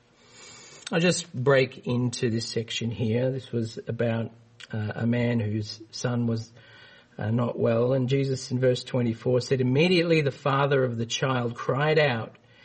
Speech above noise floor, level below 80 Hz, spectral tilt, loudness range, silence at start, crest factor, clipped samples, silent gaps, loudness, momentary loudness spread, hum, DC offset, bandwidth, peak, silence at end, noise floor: 26 dB; -64 dBFS; -6 dB/octave; 5 LU; 0.4 s; 18 dB; under 0.1%; none; -26 LUFS; 11 LU; none; under 0.1%; 8.8 kHz; -8 dBFS; 0.35 s; -51 dBFS